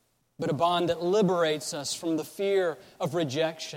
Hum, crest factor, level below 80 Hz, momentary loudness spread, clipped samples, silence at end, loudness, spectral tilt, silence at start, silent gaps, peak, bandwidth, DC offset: none; 14 dB; -68 dBFS; 7 LU; under 0.1%; 0 s; -28 LUFS; -4.5 dB/octave; 0.4 s; none; -14 dBFS; 16.5 kHz; under 0.1%